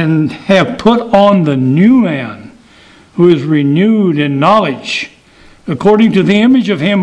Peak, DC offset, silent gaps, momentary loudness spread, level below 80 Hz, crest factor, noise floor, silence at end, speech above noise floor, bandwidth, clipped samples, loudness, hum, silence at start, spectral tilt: 0 dBFS; under 0.1%; none; 10 LU; -46 dBFS; 10 dB; -41 dBFS; 0 s; 32 dB; 10 kHz; 0.4%; -10 LUFS; none; 0 s; -7.5 dB/octave